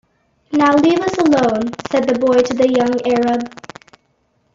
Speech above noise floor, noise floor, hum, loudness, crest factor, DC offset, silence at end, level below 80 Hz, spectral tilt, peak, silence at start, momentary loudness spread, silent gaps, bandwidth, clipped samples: 48 dB; -62 dBFS; none; -15 LUFS; 14 dB; under 0.1%; 1.05 s; -52 dBFS; -5.5 dB/octave; -2 dBFS; 0.5 s; 8 LU; none; 7.8 kHz; under 0.1%